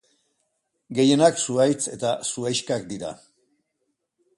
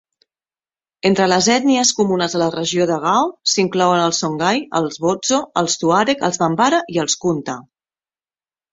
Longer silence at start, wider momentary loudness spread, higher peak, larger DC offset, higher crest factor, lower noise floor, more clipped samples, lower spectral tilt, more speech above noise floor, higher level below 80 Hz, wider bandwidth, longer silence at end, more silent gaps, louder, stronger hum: second, 0.9 s vs 1.05 s; first, 15 LU vs 5 LU; about the same, -4 dBFS vs -2 dBFS; neither; about the same, 20 dB vs 16 dB; second, -76 dBFS vs under -90 dBFS; neither; about the same, -4 dB/octave vs -3.5 dB/octave; second, 54 dB vs over 73 dB; second, -66 dBFS vs -58 dBFS; first, 11.5 kHz vs 8 kHz; about the same, 1.2 s vs 1.1 s; neither; second, -22 LUFS vs -17 LUFS; neither